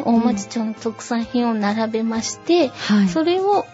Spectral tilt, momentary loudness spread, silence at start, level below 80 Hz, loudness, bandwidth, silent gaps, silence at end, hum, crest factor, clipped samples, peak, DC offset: -5 dB/octave; 7 LU; 0 s; -56 dBFS; -20 LUFS; 8 kHz; none; 0 s; none; 14 dB; under 0.1%; -6 dBFS; under 0.1%